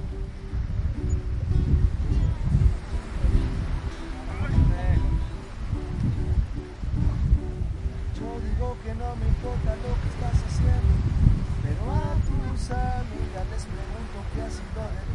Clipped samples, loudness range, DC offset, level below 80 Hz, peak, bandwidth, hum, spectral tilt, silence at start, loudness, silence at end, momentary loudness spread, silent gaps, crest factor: under 0.1%; 4 LU; under 0.1%; -28 dBFS; -4 dBFS; 10.5 kHz; none; -7.5 dB/octave; 0 s; -28 LUFS; 0 s; 10 LU; none; 22 dB